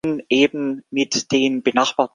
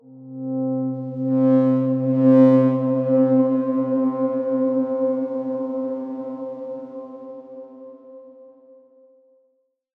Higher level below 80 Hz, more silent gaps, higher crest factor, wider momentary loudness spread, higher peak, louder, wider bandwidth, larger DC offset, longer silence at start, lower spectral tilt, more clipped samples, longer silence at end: first, -62 dBFS vs -82 dBFS; neither; about the same, 18 dB vs 18 dB; second, 6 LU vs 22 LU; about the same, -2 dBFS vs -4 dBFS; about the same, -19 LUFS vs -20 LUFS; first, 10 kHz vs 3.2 kHz; neither; about the same, 0.05 s vs 0.1 s; second, -3.5 dB/octave vs -11.5 dB/octave; neither; second, 0.05 s vs 1.55 s